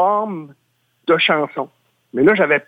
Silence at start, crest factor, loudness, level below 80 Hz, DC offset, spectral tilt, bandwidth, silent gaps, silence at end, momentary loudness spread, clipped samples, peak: 0 s; 16 dB; -17 LUFS; -60 dBFS; under 0.1%; -7 dB/octave; 5 kHz; none; 0.05 s; 15 LU; under 0.1%; -2 dBFS